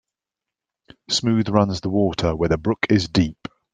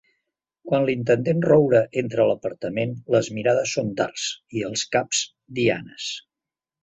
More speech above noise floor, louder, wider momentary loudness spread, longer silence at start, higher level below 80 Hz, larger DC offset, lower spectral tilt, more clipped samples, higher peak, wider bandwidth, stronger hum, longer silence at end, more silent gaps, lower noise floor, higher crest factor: about the same, 67 dB vs 67 dB; about the same, -21 LUFS vs -23 LUFS; second, 4 LU vs 11 LU; first, 1.1 s vs 0.65 s; first, -44 dBFS vs -60 dBFS; neither; about the same, -5.5 dB/octave vs -4.5 dB/octave; neither; first, 0 dBFS vs -4 dBFS; first, 9.4 kHz vs 8.4 kHz; neither; second, 0.4 s vs 0.65 s; neither; about the same, -87 dBFS vs -89 dBFS; about the same, 22 dB vs 18 dB